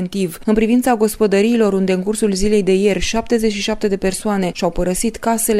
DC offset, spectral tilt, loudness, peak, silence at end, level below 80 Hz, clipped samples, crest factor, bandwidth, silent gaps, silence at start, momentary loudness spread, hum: under 0.1%; -5 dB/octave; -17 LUFS; -2 dBFS; 0 s; -34 dBFS; under 0.1%; 14 dB; 15.5 kHz; none; 0 s; 5 LU; none